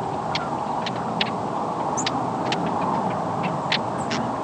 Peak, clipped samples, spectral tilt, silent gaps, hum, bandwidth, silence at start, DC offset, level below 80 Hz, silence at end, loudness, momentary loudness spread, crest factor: -4 dBFS; under 0.1%; -4.5 dB/octave; none; none; 11 kHz; 0 s; under 0.1%; -56 dBFS; 0 s; -25 LUFS; 3 LU; 20 dB